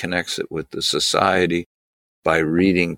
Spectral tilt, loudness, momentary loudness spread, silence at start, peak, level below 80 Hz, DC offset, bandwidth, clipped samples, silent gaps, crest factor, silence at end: -4 dB/octave; -20 LUFS; 9 LU; 0 s; -2 dBFS; -50 dBFS; under 0.1%; 17.5 kHz; under 0.1%; 1.66-2.23 s; 18 dB; 0 s